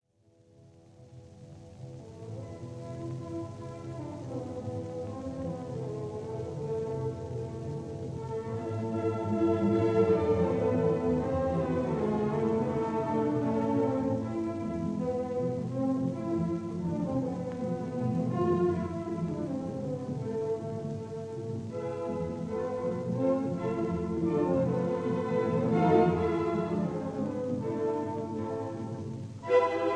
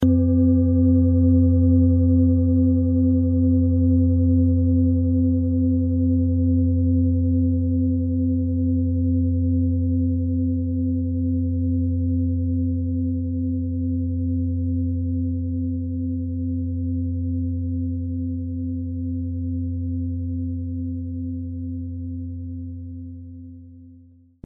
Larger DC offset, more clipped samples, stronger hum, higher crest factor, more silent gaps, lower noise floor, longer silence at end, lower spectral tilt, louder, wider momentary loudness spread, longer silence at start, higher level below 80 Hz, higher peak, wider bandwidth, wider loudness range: neither; neither; neither; first, 20 dB vs 14 dB; neither; first, -64 dBFS vs -50 dBFS; second, 0 s vs 0.5 s; second, -8.5 dB/octave vs -16 dB/octave; second, -31 LUFS vs -22 LUFS; about the same, 12 LU vs 12 LU; first, 1 s vs 0 s; second, -56 dBFS vs -36 dBFS; second, -12 dBFS vs -6 dBFS; first, 10 kHz vs 1.2 kHz; about the same, 10 LU vs 10 LU